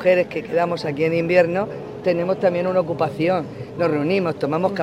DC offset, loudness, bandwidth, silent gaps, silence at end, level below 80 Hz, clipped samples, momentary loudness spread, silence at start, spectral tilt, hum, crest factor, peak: under 0.1%; -21 LUFS; 10.5 kHz; none; 0 s; -56 dBFS; under 0.1%; 7 LU; 0 s; -7.5 dB/octave; none; 18 dB; -2 dBFS